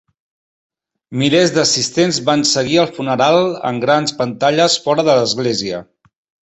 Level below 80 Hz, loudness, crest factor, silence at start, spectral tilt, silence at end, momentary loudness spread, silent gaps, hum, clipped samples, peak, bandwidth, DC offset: -56 dBFS; -15 LUFS; 14 dB; 1.1 s; -3.5 dB/octave; 0.65 s; 6 LU; none; none; under 0.1%; -2 dBFS; 8.4 kHz; under 0.1%